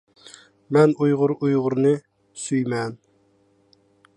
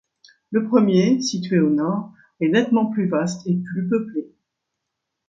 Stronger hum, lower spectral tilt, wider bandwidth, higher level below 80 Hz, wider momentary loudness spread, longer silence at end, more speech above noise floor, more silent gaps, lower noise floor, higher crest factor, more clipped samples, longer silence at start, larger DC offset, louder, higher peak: neither; about the same, -7 dB/octave vs -6.5 dB/octave; first, 10.5 kHz vs 7.8 kHz; about the same, -70 dBFS vs -66 dBFS; about the same, 10 LU vs 9 LU; first, 1.2 s vs 1.05 s; second, 42 dB vs 61 dB; neither; second, -62 dBFS vs -80 dBFS; about the same, 18 dB vs 18 dB; neither; first, 0.7 s vs 0.5 s; neither; about the same, -21 LUFS vs -20 LUFS; about the same, -4 dBFS vs -4 dBFS